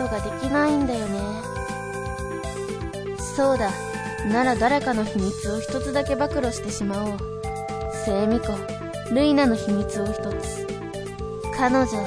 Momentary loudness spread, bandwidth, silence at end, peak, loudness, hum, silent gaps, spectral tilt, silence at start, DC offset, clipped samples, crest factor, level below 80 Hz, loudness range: 10 LU; 11 kHz; 0 s; -6 dBFS; -25 LUFS; none; none; -5.5 dB/octave; 0 s; under 0.1%; under 0.1%; 18 dB; -40 dBFS; 3 LU